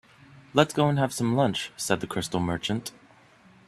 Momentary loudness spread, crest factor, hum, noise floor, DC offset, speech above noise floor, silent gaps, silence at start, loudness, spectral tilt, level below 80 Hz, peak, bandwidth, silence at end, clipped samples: 8 LU; 24 dB; none; -56 dBFS; under 0.1%; 30 dB; none; 0.35 s; -26 LUFS; -5 dB/octave; -58 dBFS; -4 dBFS; 14 kHz; 0.8 s; under 0.1%